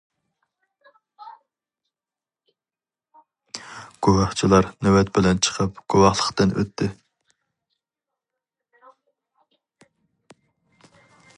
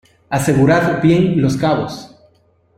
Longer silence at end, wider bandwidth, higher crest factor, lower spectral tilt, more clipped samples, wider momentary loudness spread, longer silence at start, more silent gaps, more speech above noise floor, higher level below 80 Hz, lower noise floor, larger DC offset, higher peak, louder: first, 4.45 s vs 0.7 s; second, 10.5 kHz vs 14.5 kHz; first, 24 dB vs 14 dB; second, -5 dB/octave vs -6.5 dB/octave; neither; first, 18 LU vs 11 LU; first, 1.2 s vs 0.3 s; neither; first, over 71 dB vs 42 dB; about the same, -46 dBFS vs -44 dBFS; first, under -90 dBFS vs -56 dBFS; neither; about the same, -2 dBFS vs -2 dBFS; second, -20 LUFS vs -15 LUFS